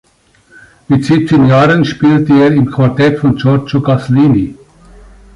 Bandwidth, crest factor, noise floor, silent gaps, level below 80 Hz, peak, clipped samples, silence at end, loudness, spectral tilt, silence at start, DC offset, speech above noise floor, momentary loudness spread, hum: 11 kHz; 10 dB; -49 dBFS; none; -40 dBFS; 0 dBFS; under 0.1%; 0.8 s; -10 LUFS; -8 dB/octave; 0.9 s; under 0.1%; 40 dB; 5 LU; none